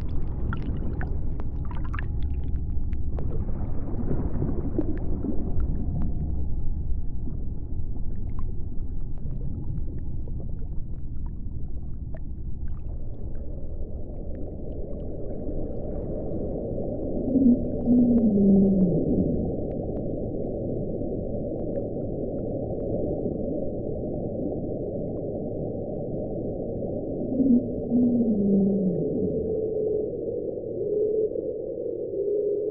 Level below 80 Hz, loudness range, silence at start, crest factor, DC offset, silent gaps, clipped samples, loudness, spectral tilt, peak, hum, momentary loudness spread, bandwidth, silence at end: -32 dBFS; 13 LU; 0 s; 16 dB; 0.3%; none; under 0.1%; -28 LUFS; -12 dB/octave; -10 dBFS; none; 15 LU; 2.9 kHz; 0 s